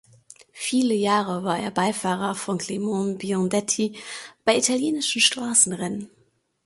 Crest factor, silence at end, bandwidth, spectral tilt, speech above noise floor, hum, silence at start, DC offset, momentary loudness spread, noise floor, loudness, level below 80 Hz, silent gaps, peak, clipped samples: 22 dB; 0.6 s; 12 kHz; -3 dB/octave; 41 dB; none; 0.55 s; under 0.1%; 11 LU; -65 dBFS; -23 LUFS; -66 dBFS; none; -4 dBFS; under 0.1%